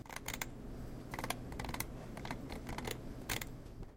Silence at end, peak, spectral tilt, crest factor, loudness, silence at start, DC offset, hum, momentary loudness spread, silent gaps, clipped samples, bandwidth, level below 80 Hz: 0 s; -20 dBFS; -3.5 dB/octave; 24 dB; -44 LUFS; 0 s; under 0.1%; none; 7 LU; none; under 0.1%; 16.5 kHz; -50 dBFS